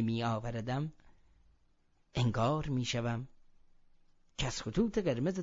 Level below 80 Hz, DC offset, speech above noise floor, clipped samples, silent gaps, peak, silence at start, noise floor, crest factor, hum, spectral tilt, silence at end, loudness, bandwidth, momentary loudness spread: -52 dBFS; under 0.1%; 37 dB; under 0.1%; none; -18 dBFS; 0 s; -70 dBFS; 18 dB; none; -6 dB/octave; 0 s; -35 LUFS; 7.4 kHz; 10 LU